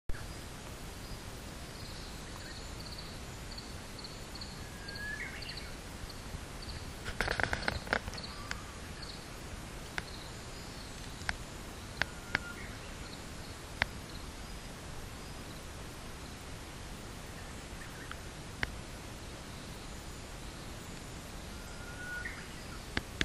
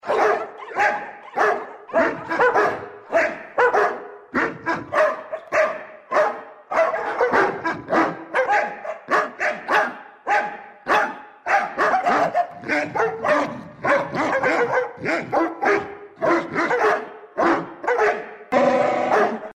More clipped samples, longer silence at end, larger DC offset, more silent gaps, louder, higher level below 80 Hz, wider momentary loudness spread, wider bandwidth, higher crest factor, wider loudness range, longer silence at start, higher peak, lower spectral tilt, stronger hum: neither; about the same, 0 s vs 0 s; neither; neither; second, -42 LUFS vs -21 LUFS; first, -48 dBFS vs -62 dBFS; about the same, 9 LU vs 8 LU; first, 15.5 kHz vs 13.5 kHz; first, 36 dB vs 16 dB; first, 7 LU vs 1 LU; about the same, 0.1 s vs 0.05 s; about the same, -6 dBFS vs -6 dBFS; second, -3.5 dB/octave vs -5 dB/octave; neither